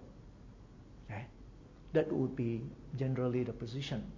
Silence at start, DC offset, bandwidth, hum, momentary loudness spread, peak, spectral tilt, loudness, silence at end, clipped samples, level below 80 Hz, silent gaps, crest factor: 0 s; under 0.1%; 7.6 kHz; none; 23 LU; -16 dBFS; -8 dB/octave; -37 LUFS; 0 s; under 0.1%; -58 dBFS; none; 22 dB